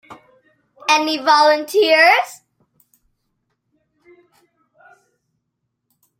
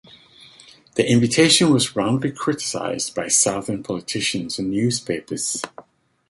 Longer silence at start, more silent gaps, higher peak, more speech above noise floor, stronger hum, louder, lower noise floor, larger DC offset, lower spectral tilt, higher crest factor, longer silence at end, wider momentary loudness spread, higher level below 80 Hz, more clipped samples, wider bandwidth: second, 0.1 s vs 0.95 s; neither; about the same, 0 dBFS vs -2 dBFS; first, 61 dB vs 28 dB; neither; first, -14 LUFS vs -20 LUFS; first, -75 dBFS vs -48 dBFS; neither; second, -0.5 dB/octave vs -3.5 dB/octave; about the same, 20 dB vs 20 dB; first, 3.85 s vs 0.5 s; second, 9 LU vs 12 LU; second, -74 dBFS vs -56 dBFS; neither; first, 16.5 kHz vs 12 kHz